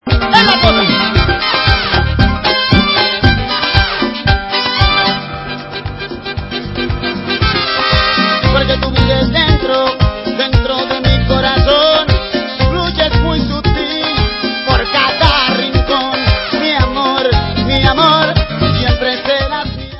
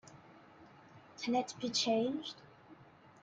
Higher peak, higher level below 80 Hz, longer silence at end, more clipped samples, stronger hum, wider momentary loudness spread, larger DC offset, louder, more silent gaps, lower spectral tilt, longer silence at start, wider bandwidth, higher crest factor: first, 0 dBFS vs -22 dBFS; first, -20 dBFS vs -80 dBFS; second, 0 s vs 0.15 s; first, 0.1% vs under 0.1%; neither; second, 8 LU vs 25 LU; neither; first, -12 LUFS vs -36 LUFS; neither; first, -7 dB/octave vs -3 dB/octave; about the same, 0.05 s vs 0.05 s; second, 8 kHz vs 9.4 kHz; second, 12 dB vs 18 dB